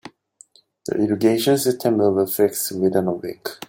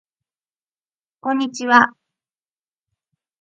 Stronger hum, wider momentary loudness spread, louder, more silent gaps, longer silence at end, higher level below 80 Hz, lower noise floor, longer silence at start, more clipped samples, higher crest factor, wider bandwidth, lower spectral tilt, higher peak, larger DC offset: neither; about the same, 10 LU vs 10 LU; second, -20 LUFS vs -17 LUFS; neither; second, 0.05 s vs 1.5 s; first, -64 dBFS vs -72 dBFS; second, -52 dBFS vs under -90 dBFS; second, 0.05 s vs 1.25 s; neither; second, 16 dB vs 22 dB; first, 17 kHz vs 8.8 kHz; first, -5 dB/octave vs -3 dB/octave; second, -4 dBFS vs 0 dBFS; neither